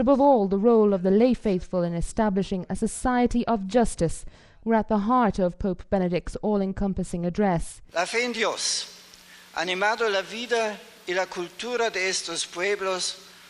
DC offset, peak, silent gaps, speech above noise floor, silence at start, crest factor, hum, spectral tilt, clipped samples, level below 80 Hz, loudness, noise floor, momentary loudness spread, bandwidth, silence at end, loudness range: under 0.1%; -8 dBFS; none; 25 dB; 0 s; 18 dB; none; -4.5 dB/octave; under 0.1%; -42 dBFS; -25 LUFS; -49 dBFS; 9 LU; 13.5 kHz; 0.2 s; 4 LU